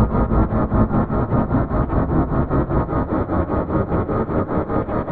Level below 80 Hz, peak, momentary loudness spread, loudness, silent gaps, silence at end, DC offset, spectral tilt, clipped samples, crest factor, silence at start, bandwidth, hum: -26 dBFS; -4 dBFS; 3 LU; -20 LUFS; none; 0 s; 0.9%; -12.5 dB/octave; under 0.1%; 14 dB; 0 s; 4.5 kHz; none